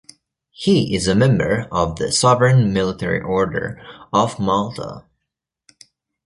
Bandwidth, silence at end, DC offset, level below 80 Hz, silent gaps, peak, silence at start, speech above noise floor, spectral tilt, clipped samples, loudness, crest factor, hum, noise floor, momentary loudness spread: 11.5 kHz; 1.25 s; under 0.1%; -44 dBFS; none; -2 dBFS; 0.6 s; 63 dB; -5.5 dB/octave; under 0.1%; -18 LUFS; 18 dB; none; -80 dBFS; 12 LU